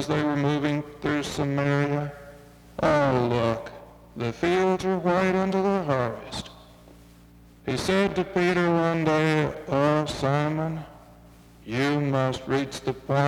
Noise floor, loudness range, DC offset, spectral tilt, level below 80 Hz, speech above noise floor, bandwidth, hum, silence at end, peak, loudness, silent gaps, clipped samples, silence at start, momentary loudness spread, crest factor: -51 dBFS; 3 LU; under 0.1%; -6.5 dB/octave; -52 dBFS; 27 dB; 15.5 kHz; none; 0 s; -8 dBFS; -25 LUFS; none; under 0.1%; 0 s; 12 LU; 18 dB